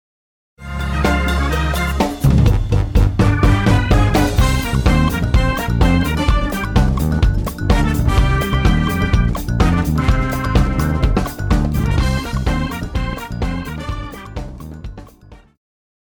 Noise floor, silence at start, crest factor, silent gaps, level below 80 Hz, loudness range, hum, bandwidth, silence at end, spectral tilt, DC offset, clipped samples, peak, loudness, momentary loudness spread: -43 dBFS; 0.6 s; 12 dB; none; -20 dBFS; 7 LU; none; over 20 kHz; 0.7 s; -6.5 dB/octave; under 0.1%; under 0.1%; -4 dBFS; -17 LUFS; 11 LU